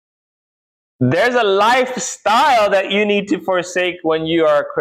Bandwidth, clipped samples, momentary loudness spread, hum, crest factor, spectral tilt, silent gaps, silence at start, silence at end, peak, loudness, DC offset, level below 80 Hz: 15.5 kHz; under 0.1%; 7 LU; none; 10 dB; -4 dB/octave; none; 1 s; 0 s; -6 dBFS; -15 LUFS; under 0.1%; -58 dBFS